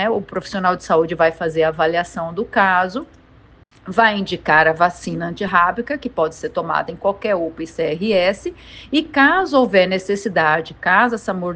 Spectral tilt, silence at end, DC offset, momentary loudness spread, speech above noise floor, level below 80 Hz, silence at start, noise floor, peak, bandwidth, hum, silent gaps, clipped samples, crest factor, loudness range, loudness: -5 dB/octave; 0 s; under 0.1%; 11 LU; 30 dB; -50 dBFS; 0 s; -48 dBFS; 0 dBFS; 9.4 kHz; none; none; under 0.1%; 18 dB; 4 LU; -18 LUFS